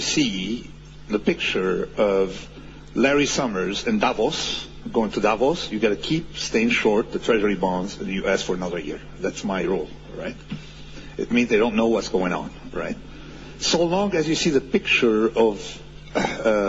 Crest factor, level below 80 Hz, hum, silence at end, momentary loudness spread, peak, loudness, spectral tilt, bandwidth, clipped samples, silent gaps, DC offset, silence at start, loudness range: 18 dB; -44 dBFS; none; 0 s; 16 LU; -6 dBFS; -22 LUFS; -4 dB/octave; 8 kHz; under 0.1%; none; under 0.1%; 0 s; 4 LU